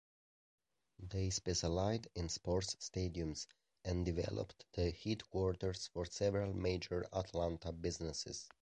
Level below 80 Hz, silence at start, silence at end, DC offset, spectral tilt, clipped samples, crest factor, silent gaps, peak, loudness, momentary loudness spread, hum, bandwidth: -52 dBFS; 1 s; 0.15 s; under 0.1%; -5 dB/octave; under 0.1%; 18 dB; none; -22 dBFS; -41 LUFS; 7 LU; none; 9.6 kHz